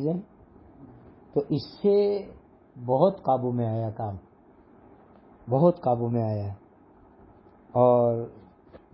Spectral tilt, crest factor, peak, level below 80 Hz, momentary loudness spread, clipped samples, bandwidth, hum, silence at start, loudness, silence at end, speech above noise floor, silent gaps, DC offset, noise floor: -12.5 dB/octave; 20 dB; -8 dBFS; -58 dBFS; 17 LU; under 0.1%; 5.8 kHz; none; 0 s; -25 LUFS; 0.15 s; 31 dB; none; under 0.1%; -55 dBFS